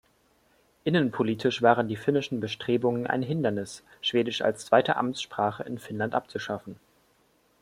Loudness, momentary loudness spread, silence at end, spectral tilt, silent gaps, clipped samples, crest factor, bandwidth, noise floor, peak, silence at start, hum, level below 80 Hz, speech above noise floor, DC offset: -27 LUFS; 12 LU; 0.9 s; -5.5 dB/octave; none; under 0.1%; 24 dB; 15.5 kHz; -66 dBFS; -4 dBFS; 0.85 s; none; -68 dBFS; 39 dB; under 0.1%